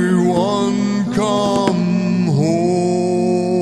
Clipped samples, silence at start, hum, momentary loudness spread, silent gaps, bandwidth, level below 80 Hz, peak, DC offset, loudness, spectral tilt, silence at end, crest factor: under 0.1%; 0 s; none; 2 LU; none; 11.5 kHz; -54 dBFS; 0 dBFS; 0.3%; -16 LUFS; -6.5 dB/octave; 0 s; 16 dB